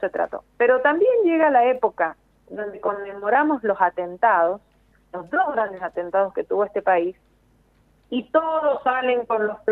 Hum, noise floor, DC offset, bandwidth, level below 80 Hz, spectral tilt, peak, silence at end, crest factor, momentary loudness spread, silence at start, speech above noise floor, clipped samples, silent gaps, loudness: none; -59 dBFS; under 0.1%; 4.1 kHz; -62 dBFS; -7.5 dB/octave; -4 dBFS; 0 s; 18 dB; 12 LU; 0 s; 38 dB; under 0.1%; none; -21 LUFS